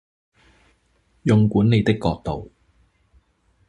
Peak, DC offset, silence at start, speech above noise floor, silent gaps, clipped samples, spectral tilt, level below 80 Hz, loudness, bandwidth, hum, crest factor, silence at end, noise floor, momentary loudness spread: -4 dBFS; under 0.1%; 1.25 s; 45 dB; none; under 0.1%; -8 dB/octave; -44 dBFS; -20 LUFS; 9.8 kHz; none; 20 dB; 1.25 s; -63 dBFS; 12 LU